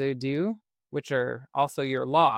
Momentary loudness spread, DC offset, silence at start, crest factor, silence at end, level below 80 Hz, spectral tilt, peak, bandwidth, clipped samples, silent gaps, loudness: 11 LU; under 0.1%; 0 s; 18 dB; 0 s; -70 dBFS; -6 dB/octave; -8 dBFS; 16 kHz; under 0.1%; none; -28 LUFS